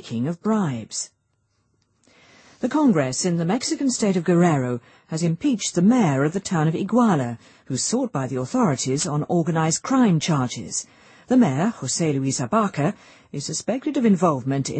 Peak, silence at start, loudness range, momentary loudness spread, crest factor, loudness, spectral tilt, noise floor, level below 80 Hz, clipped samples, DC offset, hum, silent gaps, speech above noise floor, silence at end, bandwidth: -6 dBFS; 0.05 s; 3 LU; 11 LU; 16 dB; -22 LUFS; -5.5 dB/octave; -69 dBFS; -62 dBFS; under 0.1%; under 0.1%; none; none; 48 dB; 0 s; 8.8 kHz